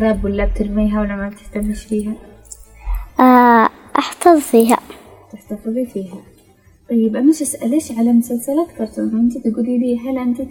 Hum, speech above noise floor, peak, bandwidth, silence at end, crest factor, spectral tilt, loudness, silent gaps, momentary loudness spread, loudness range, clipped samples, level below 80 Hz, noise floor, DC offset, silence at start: none; 34 dB; 0 dBFS; 18 kHz; 0 s; 16 dB; -5.5 dB/octave; -16 LUFS; none; 15 LU; 5 LU; under 0.1%; -32 dBFS; -50 dBFS; under 0.1%; 0 s